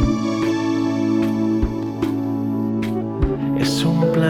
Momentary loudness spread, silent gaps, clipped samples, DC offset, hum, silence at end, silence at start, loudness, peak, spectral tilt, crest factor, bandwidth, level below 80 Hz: 4 LU; none; under 0.1%; under 0.1%; none; 0 s; 0 s; -20 LUFS; -4 dBFS; -6.5 dB/octave; 14 dB; 16 kHz; -32 dBFS